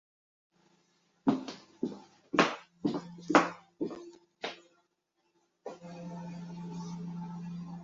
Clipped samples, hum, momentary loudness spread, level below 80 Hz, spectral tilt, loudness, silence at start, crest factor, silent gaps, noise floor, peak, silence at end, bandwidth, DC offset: under 0.1%; none; 20 LU; -74 dBFS; -4 dB/octave; -34 LUFS; 1.25 s; 30 dB; none; -78 dBFS; -6 dBFS; 0 s; 7.6 kHz; under 0.1%